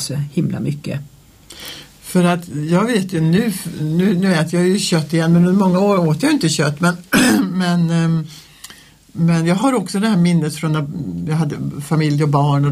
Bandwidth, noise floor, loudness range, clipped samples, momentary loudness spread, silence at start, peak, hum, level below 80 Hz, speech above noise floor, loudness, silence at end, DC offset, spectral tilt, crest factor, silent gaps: 15.5 kHz; -43 dBFS; 4 LU; under 0.1%; 13 LU; 0 s; -2 dBFS; none; -50 dBFS; 27 dB; -16 LUFS; 0 s; under 0.1%; -6 dB/octave; 14 dB; none